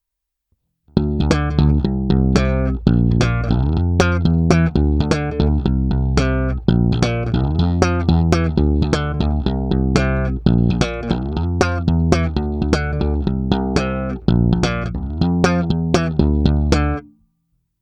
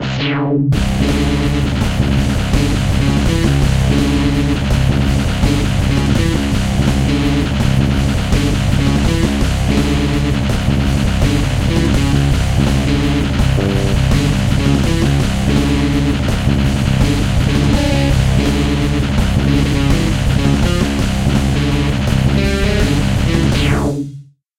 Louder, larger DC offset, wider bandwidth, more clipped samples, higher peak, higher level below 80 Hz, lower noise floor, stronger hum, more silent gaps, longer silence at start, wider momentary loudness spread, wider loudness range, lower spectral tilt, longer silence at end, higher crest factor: second, -18 LUFS vs -15 LUFS; neither; second, 9.6 kHz vs 16 kHz; neither; about the same, 0 dBFS vs 0 dBFS; about the same, -24 dBFS vs -20 dBFS; first, -80 dBFS vs -35 dBFS; neither; neither; first, 0.95 s vs 0 s; first, 5 LU vs 2 LU; about the same, 2 LU vs 1 LU; about the same, -7 dB/octave vs -6 dB/octave; first, 0.8 s vs 0.35 s; about the same, 16 dB vs 12 dB